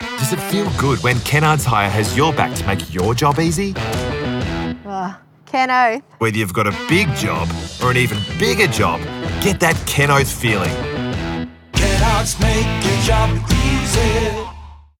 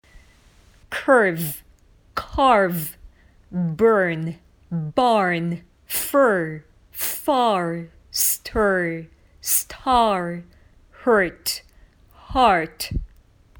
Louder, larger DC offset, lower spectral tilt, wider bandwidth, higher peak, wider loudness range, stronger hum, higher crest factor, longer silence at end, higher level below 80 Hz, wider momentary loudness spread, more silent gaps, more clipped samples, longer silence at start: first, -17 LUFS vs -21 LUFS; neither; about the same, -4.5 dB/octave vs -4 dB/octave; second, 18 kHz vs over 20 kHz; about the same, -2 dBFS vs -2 dBFS; about the same, 3 LU vs 2 LU; neither; about the same, 16 dB vs 20 dB; second, 0.2 s vs 0.55 s; first, -28 dBFS vs -42 dBFS; second, 8 LU vs 15 LU; neither; neither; second, 0 s vs 0.9 s